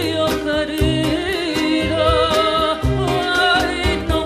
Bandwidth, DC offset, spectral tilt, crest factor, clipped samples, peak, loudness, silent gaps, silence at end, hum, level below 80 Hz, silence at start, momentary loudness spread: 15.5 kHz; under 0.1%; -5 dB/octave; 14 dB; under 0.1%; -4 dBFS; -17 LUFS; none; 0 s; none; -30 dBFS; 0 s; 5 LU